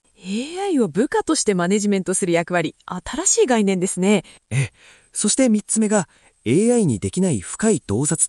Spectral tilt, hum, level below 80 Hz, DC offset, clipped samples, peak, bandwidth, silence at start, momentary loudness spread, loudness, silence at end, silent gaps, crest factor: -4.5 dB/octave; none; -52 dBFS; under 0.1%; under 0.1%; -4 dBFS; 12 kHz; 0.25 s; 11 LU; -20 LUFS; 0 s; none; 16 dB